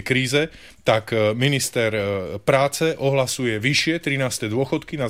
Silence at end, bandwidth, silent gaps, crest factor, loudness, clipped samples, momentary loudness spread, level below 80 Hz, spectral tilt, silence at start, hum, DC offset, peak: 0 s; 16 kHz; none; 16 dB; -21 LUFS; under 0.1%; 5 LU; -52 dBFS; -4.5 dB/octave; 0 s; none; 0.2%; -6 dBFS